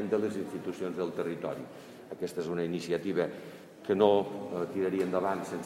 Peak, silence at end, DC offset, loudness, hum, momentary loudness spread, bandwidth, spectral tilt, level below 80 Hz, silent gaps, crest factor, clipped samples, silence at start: -10 dBFS; 0 s; under 0.1%; -32 LUFS; none; 17 LU; 15 kHz; -6.5 dB/octave; -74 dBFS; none; 22 dB; under 0.1%; 0 s